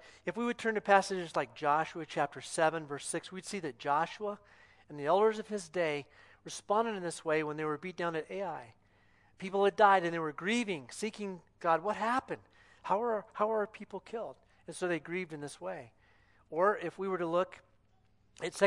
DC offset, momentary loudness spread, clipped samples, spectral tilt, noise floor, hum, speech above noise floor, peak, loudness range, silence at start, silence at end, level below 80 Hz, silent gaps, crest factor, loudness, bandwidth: under 0.1%; 14 LU; under 0.1%; -4.5 dB/octave; -68 dBFS; 60 Hz at -65 dBFS; 35 dB; -10 dBFS; 5 LU; 0 s; 0 s; -74 dBFS; none; 24 dB; -34 LUFS; 12 kHz